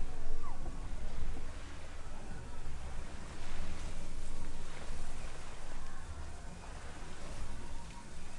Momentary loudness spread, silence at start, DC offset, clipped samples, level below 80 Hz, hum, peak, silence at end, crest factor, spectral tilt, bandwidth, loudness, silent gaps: 4 LU; 0 s; under 0.1%; under 0.1%; -40 dBFS; none; -18 dBFS; 0 s; 14 dB; -4.5 dB/octave; 10.5 kHz; -48 LUFS; none